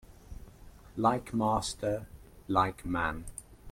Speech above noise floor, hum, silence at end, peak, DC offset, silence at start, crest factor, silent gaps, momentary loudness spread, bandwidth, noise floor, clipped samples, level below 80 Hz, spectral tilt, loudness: 22 dB; none; 0 s; -12 dBFS; under 0.1%; 0.1 s; 22 dB; none; 22 LU; 16.5 kHz; -52 dBFS; under 0.1%; -50 dBFS; -5 dB/octave; -32 LUFS